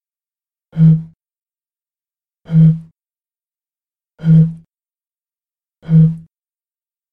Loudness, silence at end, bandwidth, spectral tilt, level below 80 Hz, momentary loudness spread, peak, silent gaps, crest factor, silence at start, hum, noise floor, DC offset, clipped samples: -13 LUFS; 0.9 s; 3.3 kHz; -12 dB/octave; -50 dBFS; 12 LU; -2 dBFS; 1.16-1.20 s; 16 dB; 0.75 s; none; under -90 dBFS; under 0.1%; under 0.1%